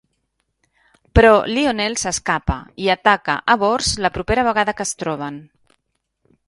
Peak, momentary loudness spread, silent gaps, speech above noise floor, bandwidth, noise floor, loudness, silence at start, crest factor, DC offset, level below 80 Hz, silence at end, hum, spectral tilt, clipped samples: 0 dBFS; 12 LU; none; 56 dB; 11.5 kHz; -73 dBFS; -18 LUFS; 1.15 s; 20 dB; under 0.1%; -34 dBFS; 1.05 s; none; -4 dB/octave; under 0.1%